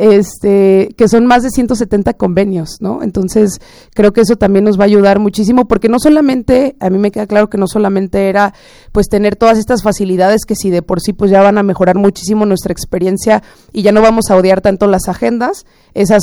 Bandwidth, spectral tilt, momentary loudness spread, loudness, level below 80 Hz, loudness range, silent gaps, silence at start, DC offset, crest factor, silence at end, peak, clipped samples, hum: over 20 kHz; -6 dB/octave; 8 LU; -11 LUFS; -34 dBFS; 2 LU; none; 0 s; under 0.1%; 10 dB; 0 s; 0 dBFS; 0.5%; none